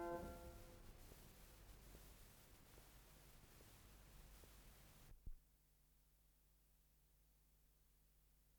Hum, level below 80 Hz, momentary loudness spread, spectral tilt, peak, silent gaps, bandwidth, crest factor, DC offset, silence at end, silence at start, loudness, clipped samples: none; -66 dBFS; 8 LU; -5 dB/octave; -38 dBFS; none; over 20 kHz; 24 dB; under 0.1%; 0 s; 0 s; -63 LUFS; under 0.1%